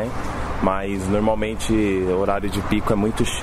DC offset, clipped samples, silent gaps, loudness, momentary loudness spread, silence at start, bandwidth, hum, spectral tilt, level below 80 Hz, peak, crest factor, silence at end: under 0.1%; under 0.1%; none; -22 LUFS; 4 LU; 0 s; 14.5 kHz; none; -5.5 dB/octave; -32 dBFS; -6 dBFS; 16 dB; 0 s